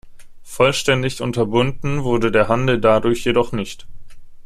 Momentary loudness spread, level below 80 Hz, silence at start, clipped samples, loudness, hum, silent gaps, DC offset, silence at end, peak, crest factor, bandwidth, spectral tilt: 10 LU; -38 dBFS; 0.05 s; under 0.1%; -18 LUFS; none; none; under 0.1%; 0.05 s; -2 dBFS; 18 dB; 14.5 kHz; -5.5 dB/octave